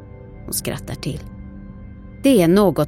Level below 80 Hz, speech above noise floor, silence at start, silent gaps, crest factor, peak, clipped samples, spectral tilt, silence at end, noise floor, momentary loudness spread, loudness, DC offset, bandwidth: -40 dBFS; 20 dB; 0 s; none; 16 dB; -4 dBFS; under 0.1%; -5.5 dB/octave; 0 s; -37 dBFS; 25 LU; -19 LUFS; under 0.1%; 16.5 kHz